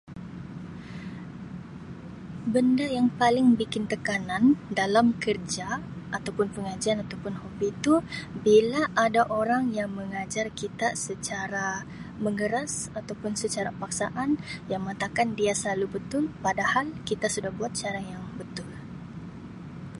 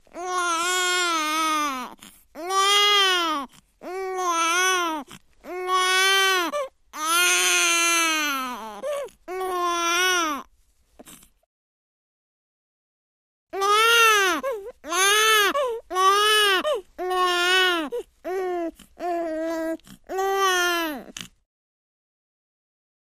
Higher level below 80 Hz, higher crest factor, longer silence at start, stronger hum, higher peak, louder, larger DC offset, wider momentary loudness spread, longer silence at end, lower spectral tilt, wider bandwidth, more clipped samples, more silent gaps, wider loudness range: first, -56 dBFS vs -62 dBFS; about the same, 20 dB vs 16 dB; about the same, 0.05 s vs 0.15 s; neither; about the same, -8 dBFS vs -8 dBFS; second, -27 LUFS vs -21 LUFS; neither; about the same, 18 LU vs 17 LU; second, 0 s vs 1.8 s; first, -4.5 dB/octave vs 1 dB/octave; second, 11.5 kHz vs 15.5 kHz; neither; second, none vs 11.46-13.47 s; about the same, 6 LU vs 7 LU